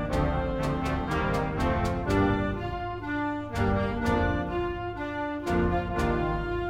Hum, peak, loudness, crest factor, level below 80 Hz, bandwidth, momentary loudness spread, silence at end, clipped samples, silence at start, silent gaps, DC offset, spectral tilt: none; -12 dBFS; -28 LUFS; 14 dB; -36 dBFS; 16 kHz; 6 LU; 0 s; under 0.1%; 0 s; none; under 0.1%; -7 dB/octave